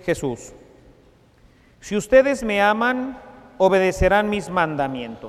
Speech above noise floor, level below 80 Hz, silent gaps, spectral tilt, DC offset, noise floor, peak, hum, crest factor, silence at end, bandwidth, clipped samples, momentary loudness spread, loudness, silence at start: 34 dB; -40 dBFS; none; -5 dB/octave; under 0.1%; -54 dBFS; -2 dBFS; none; 18 dB; 0 s; 14 kHz; under 0.1%; 12 LU; -20 LUFS; 0.05 s